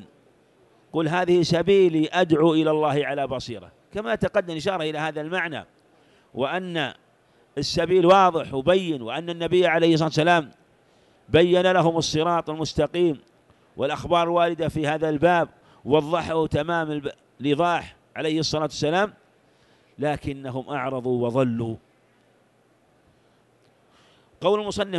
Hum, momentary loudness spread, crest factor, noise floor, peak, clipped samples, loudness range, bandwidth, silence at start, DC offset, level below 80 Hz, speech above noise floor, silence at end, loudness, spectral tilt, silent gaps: none; 12 LU; 18 dB; -61 dBFS; -4 dBFS; under 0.1%; 8 LU; 12 kHz; 0 s; under 0.1%; -52 dBFS; 39 dB; 0 s; -23 LUFS; -5.5 dB/octave; none